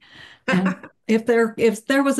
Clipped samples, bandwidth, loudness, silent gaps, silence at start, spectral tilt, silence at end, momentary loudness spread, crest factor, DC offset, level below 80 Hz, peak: under 0.1%; 12.5 kHz; -20 LUFS; none; 0.2 s; -5.5 dB/octave; 0 s; 10 LU; 14 dB; under 0.1%; -62 dBFS; -8 dBFS